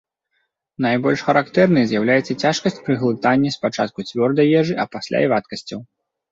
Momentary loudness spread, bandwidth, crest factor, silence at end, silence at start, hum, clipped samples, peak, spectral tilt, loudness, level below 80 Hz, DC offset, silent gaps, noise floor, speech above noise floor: 8 LU; 7.8 kHz; 18 dB; 0.5 s; 0.8 s; none; under 0.1%; -2 dBFS; -6 dB/octave; -18 LUFS; -58 dBFS; under 0.1%; none; -71 dBFS; 53 dB